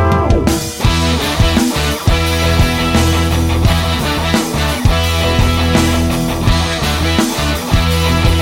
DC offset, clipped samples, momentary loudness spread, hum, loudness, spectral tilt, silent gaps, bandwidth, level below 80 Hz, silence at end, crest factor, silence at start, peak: under 0.1%; under 0.1%; 3 LU; none; -14 LUFS; -5 dB/octave; none; 16.5 kHz; -18 dBFS; 0 s; 12 dB; 0 s; 0 dBFS